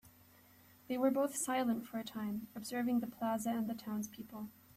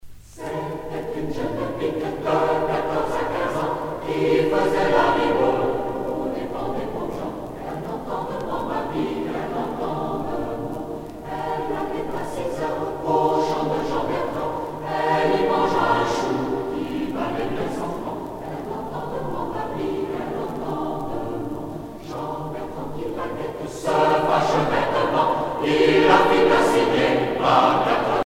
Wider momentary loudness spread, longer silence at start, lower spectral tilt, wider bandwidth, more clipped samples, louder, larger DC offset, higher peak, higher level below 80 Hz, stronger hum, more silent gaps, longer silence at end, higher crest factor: about the same, 10 LU vs 12 LU; about the same, 0.05 s vs 0.05 s; second, -4.5 dB/octave vs -6 dB/octave; about the same, 15 kHz vs 16.5 kHz; neither; second, -38 LUFS vs -23 LUFS; neither; second, -22 dBFS vs -2 dBFS; second, -76 dBFS vs -46 dBFS; neither; neither; first, 0.25 s vs 0.05 s; about the same, 18 dB vs 20 dB